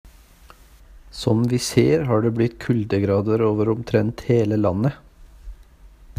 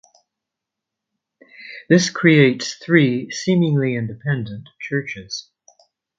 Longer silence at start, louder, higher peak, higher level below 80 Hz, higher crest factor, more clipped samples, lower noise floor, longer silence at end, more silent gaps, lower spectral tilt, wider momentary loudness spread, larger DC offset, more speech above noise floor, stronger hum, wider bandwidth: second, 0.05 s vs 1.6 s; about the same, -20 LUFS vs -18 LUFS; about the same, -2 dBFS vs 0 dBFS; first, -46 dBFS vs -60 dBFS; about the same, 20 dB vs 20 dB; neither; second, -48 dBFS vs -84 dBFS; second, 0.05 s vs 0.75 s; neither; first, -7 dB/octave vs -5.5 dB/octave; second, 6 LU vs 17 LU; neither; second, 29 dB vs 66 dB; neither; first, 15.5 kHz vs 7.8 kHz